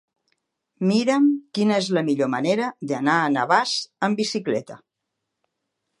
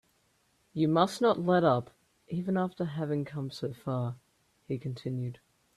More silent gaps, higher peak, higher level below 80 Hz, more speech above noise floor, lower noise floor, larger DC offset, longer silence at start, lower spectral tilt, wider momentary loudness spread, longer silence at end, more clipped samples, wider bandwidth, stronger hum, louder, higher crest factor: neither; first, -4 dBFS vs -10 dBFS; about the same, -74 dBFS vs -70 dBFS; first, 59 dB vs 41 dB; first, -81 dBFS vs -71 dBFS; neither; about the same, 0.8 s vs 0.75 s; second, -5 dB/octave vs -7 dB/octave; second, 6 LU vs 13 LU; first, 1.25 s vs 0.4 s; neither; second, 11.5 kHz vs 13 kHz; neither; first, -22 LUFS vs -31 LUFS; about the same, 20 dB vs 22 dB